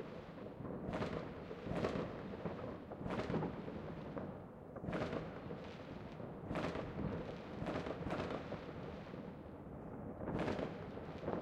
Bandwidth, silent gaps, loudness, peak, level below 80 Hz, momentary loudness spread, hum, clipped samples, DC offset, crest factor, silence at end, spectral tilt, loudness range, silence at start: 12 kHz; none; -45 LUFS; -24 dBFS; -60 dBFS; 9 LU; none; under 0.1%; under 0.1%; 20 dB; 0 s; -7.5 dB/octave; 2 LU; 0 s